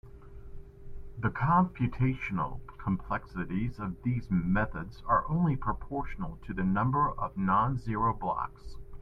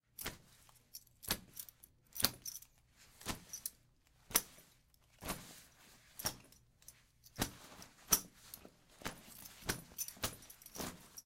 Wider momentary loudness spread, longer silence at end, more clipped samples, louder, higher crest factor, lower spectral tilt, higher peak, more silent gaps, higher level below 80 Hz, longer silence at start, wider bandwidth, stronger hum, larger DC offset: second, 13 LU vs 23 LU; about the same, 0 s vs 0.05 s; neither; first, -31 LUFS vs -41 LUFS; second, 18 dB vs 36 dB; first, -9.5 dB/octave vs -1.5 dB/octave; second, -14 dBFS vs -10 dBFS; neither; first, -44 dBFS vs -62 dBFS; second, 0.05 s vs 0.2 s; second, 5.6 kHz vs 17 kHz; neither; neither